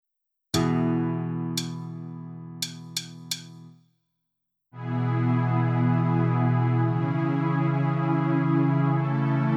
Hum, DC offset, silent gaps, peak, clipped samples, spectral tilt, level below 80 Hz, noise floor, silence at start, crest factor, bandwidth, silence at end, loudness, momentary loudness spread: none; under 0.1%; none; -10 dBFS; under 0.1%; -6.5 dB/octave; -62 dBFS; -81 dBFS; 0.55 s; 16 dB; 14.5 kHz; 0 s; -25 LUFS; 11 LU